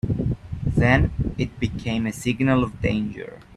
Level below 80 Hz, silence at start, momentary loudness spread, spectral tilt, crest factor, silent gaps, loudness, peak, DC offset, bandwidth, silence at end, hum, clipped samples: -34 dBFS; 0.05 s; 9 LU; -7 dB/octave; 20 dB; none; -23 LUFS; -2 dBFS; under 0.1%; 13.5 kHz; 0 s; none; under 0.1%